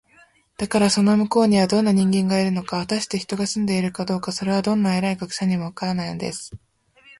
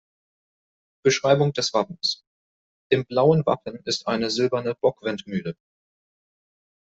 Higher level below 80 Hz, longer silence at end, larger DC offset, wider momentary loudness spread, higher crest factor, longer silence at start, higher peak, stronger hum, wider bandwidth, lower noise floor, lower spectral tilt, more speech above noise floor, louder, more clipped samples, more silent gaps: first, -54 dBFS vs -64 dBFS; second, 0.6 s vs 1.35 s; neither; about the same, 9 LU vs 11 LU; about the same, 16 dB vs 20 dB; second, 0.6 s vs 1.05 s; about the same, -6 dBFS vs -4 dBFS; neither; first, 11.5 kHz vs 8.2 kHz; second, -55 dBFS vs under -90 dBFS; about the same, -5.5 dB/octave vs -5 dB/octave; second, 35 dB vs over 67 dB; about the same, -21 LUFS vs -23 LUFS; neither; second, none vs 2.27-2.90 s